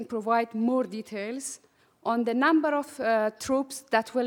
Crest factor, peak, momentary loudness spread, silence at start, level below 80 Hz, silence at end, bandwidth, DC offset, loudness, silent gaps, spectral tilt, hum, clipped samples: 20 dB; -8 dBFS; 12 LU; 0 s; -70 dBFS; 0 s; 18.5 kHz; under 0.1%; -27 LUFS; none; -4 dB/octave; none; under 0.1%